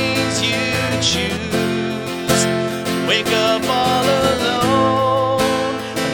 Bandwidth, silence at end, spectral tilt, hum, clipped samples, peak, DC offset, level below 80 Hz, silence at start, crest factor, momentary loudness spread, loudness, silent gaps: over 20 kHz; 0 s; -4 dB/octave; none; under 0.1%; -2 dBFS; under 0.1%; -44 dBFS; 0 s; 16 dB; 5 LU; -17 LUFS; none